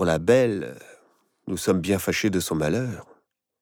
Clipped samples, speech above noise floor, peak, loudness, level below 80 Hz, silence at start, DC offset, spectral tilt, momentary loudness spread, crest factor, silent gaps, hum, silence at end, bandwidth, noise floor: under 0.1%; 40 dB; -6 dBFS; -24 LUFS; -52 dBFS; 0 s; under 0.1%; -5.5 dB/octave; 16 LU; 18 dB; none; none; 0.6 s; 20 kHz; -63 dBFS